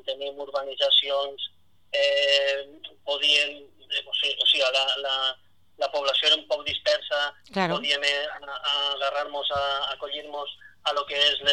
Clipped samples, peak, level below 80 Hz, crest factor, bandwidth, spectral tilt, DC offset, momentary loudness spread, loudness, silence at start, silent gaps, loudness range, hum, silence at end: under 0.1%; -8 dBFS; -64 dBFS; 18 dB; 11.5 kHz; -1.5 dB/octave; 0.2%; 13 LU; -24 LUFS; 0.05 s; none; 3 LU; none; 0 s